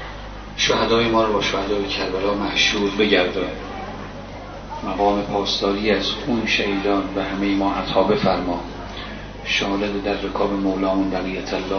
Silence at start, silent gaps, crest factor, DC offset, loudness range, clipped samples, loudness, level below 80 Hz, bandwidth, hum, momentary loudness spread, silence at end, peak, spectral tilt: 0 s; none; 18 dB; 0.1%; 3 LU; under 0.1%; -20 LUFS; -38 dBFS; 6.6 kHz; 50 Hz at -40 dBFS; 15 LU; 0 s; -2 dBFS; -4.5 dB/octave